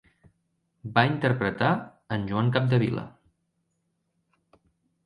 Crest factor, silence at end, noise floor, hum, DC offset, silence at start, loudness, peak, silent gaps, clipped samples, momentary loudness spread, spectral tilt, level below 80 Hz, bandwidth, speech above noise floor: 24 dB; 1.95 s; -76 dBFS; none; under 0.1%; 0.85 s; -26 LUFS; -4 dBFS; none; under 0.1%; 11 LU; -8.5 dB/octave; -58 dBFS; 9.6 kHz; 51 dB